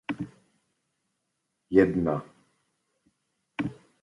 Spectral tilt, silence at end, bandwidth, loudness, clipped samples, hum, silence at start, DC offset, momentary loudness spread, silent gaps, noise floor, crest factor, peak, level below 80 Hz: -8.5 dB/octave; 0.3 s; 11 kHz; -27 LUFS; under 0.1%; none; 0.1 s; under 0.1%; 17 LU; none; -80 dBFS; 26 dB; -6 dBFS; -58 dBFS